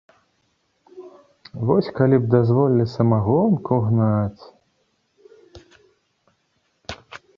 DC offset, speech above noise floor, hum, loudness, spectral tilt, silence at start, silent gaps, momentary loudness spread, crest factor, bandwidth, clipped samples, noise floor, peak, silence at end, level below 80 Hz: under 0.1%; 50 dB; none; -19 LUFS; -9.5 dB/octave; 0.95 s; none; 20 LU; 20 dB; 6.8 kHz; under 0.1%; -68 dBFS; -2 dBFS; 0.2 s; -52 dBFS